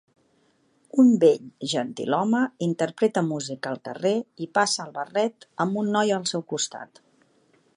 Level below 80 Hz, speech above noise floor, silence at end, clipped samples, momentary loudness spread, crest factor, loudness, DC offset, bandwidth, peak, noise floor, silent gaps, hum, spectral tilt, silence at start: -76 dBFS; 41 dB; 0.9 s; under 0.1%; 9 LU; 18 dB; -24 LUFS; under 0.1%; 11 kHz; -6 dBFS; -65 dBFS; none; none; -4.5 dB/octave; 0.95 s